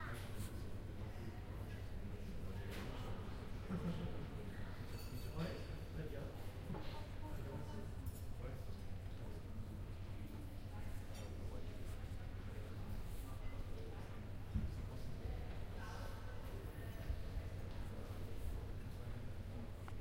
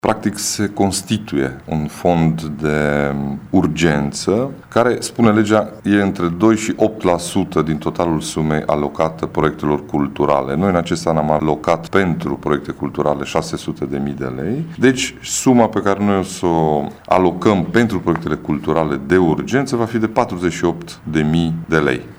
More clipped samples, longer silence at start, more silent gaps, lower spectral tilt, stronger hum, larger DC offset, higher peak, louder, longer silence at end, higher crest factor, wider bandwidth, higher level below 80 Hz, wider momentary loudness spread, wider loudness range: neither; about the same, 0 s vs 0.05 s; neither; about the same, -6.5 dB/octave vs -5.5 dB/octave; neither; neither; second, -30 dBFS vs 0 dBFS; second, -50 LUFS vs -17 LUFS; about the same, 0 s vs 0.05 s; about the same, 16 dB vs 16 dB; second, 16 kHz vs over 20 kHz; second, -50 dBFS vs -40 dBFS; about the same, 5 LU vs 6 LU; about the same, 3 LU vs 3 LU